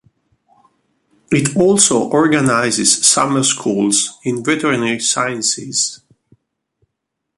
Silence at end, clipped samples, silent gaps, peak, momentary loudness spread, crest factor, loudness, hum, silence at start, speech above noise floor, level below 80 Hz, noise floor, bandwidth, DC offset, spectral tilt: 1.4 s; under 0.1%; none; 0 dBFS; 7 LU; 16 dB; -14 LUFS; none; 1.3 s; 62 dB; -56 dBFS; -77 dBFS; 12.5 kHz; under 0.1%; -3 dB/octave